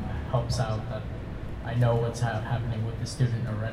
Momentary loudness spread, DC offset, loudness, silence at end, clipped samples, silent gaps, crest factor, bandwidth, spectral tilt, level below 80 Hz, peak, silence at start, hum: 11 LU; under 0.1%; -29 LUFS; 0 s; under 0.1%; none; 16 dB; 11.5 kHz; -6.5 dB/octave; -40 dBFS; -12 dBFS; 0 s; none